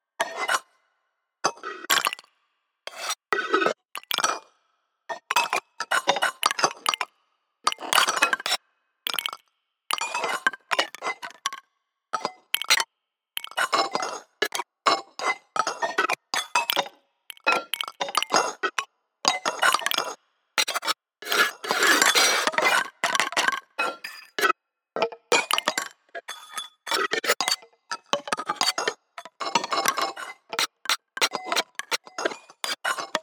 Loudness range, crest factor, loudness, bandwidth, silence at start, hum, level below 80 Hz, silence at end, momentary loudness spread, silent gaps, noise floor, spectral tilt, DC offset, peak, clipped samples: 6 LU; 28 dB; -25 LUFS; over 20 kHz; 0.2 s; none; under -90 dBFS; 0 s; 13 LU; none; -82 dBFS; 0.5 dB/octave; under 0.1%; 0 dBFS; under 0.1%